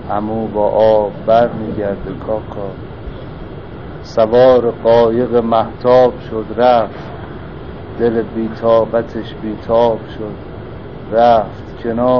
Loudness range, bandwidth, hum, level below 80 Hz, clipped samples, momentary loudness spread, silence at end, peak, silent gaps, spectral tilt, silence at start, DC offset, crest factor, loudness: 5 LU; 6.6 kHz; none; -38 dBFS; under 0.1%; 19 LU; 0 s; 0 dBFS; none; -5.5 dB/octave; 0 s; 1%; 14 dB; -14 LUFS